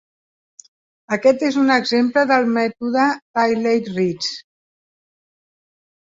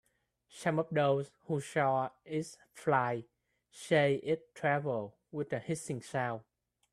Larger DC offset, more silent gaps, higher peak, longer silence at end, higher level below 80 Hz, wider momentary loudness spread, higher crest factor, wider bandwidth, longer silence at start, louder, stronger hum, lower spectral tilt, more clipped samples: neither; first, 3.22-3.34 s vs none; first, -2 dBFS vs -14 dBFS; first, 1.75 s vs 0.5 s; first, -64 dBFS vs -74 dBFS; about the same, 8 LU vs 10 LU; about the same, 18 dB vs 20 dB; second, 7.8 kHz vs 13 kHz; first, 1.1 s vs 0.55 s; first, -18 LUFS vs -34 LUFS; neither; about the same, -5 dB/octave vs -6 dB/octave; neither